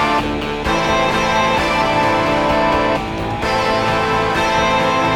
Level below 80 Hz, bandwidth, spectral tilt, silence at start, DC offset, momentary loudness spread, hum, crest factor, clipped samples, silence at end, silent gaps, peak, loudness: -34 dBFS; 17 kHz; -4.5 dB/octave; 0 s; under 0.1%; 4 LU; none; 12 dB; under 0.1%; 0 s; none; -4 dBFS; -16 LUFS